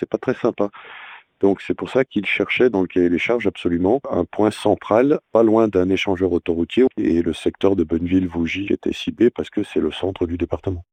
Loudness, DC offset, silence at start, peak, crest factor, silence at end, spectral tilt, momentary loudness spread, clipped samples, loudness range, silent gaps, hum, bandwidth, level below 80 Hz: -20 LUFS; under 0.1%; 0 s; -2 dBFS; 16 dB; 0.1 s; -7 dB/octave; 7 LU; under 0.1%; 3 LU; none; none; 9.6 kHz; -50 dBFS